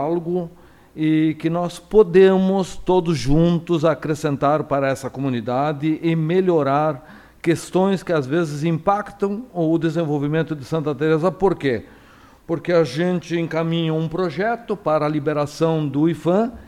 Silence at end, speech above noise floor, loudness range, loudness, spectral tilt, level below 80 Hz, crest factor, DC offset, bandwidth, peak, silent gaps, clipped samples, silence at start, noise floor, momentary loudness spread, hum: 0 s; 29 dB; 4 LU; -20 LUFS; -7 dB/octave; -42 dBFS; 18 dB; under 0.1%; 13.5 kHz; -2 dBFS; none; under 0.1%; 0 s; -48 dBFS; 7 LU; none